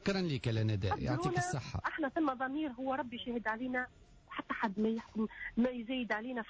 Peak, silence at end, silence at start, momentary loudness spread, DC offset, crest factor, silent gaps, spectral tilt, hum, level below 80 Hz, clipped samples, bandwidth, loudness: -24 dBFS; 0 s; 0 s; 5 LU; under 0.1%; 12 dB; none; -6 dB/octave; none; -56 dBFS; under 0.1%; 8 kHz; -36 LUFS